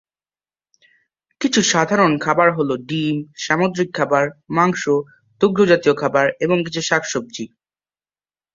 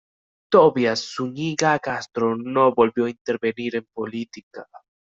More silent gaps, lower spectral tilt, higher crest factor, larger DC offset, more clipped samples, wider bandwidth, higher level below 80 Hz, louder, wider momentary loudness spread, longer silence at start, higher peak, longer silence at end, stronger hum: second, none vs 3.21-3.25 s, 4.43-4.51 s; about the same, -4.5 dB/octave vs -5 dB/octave; about the same, 18 dB vs 20 dB; neither; neither; about the same, 7.8 kHz vs 7.8 kHz; about the same, -60 dBFS vs -64 dBFS; first, -18 LUFS vs -21 LUFS; second, 9 LU vs 16 LU; first, 1.4 s vs 0.5 s; about the same, -2 dBFS vs -2 dBFS; first, 1.1 s vs 0.4 s; neither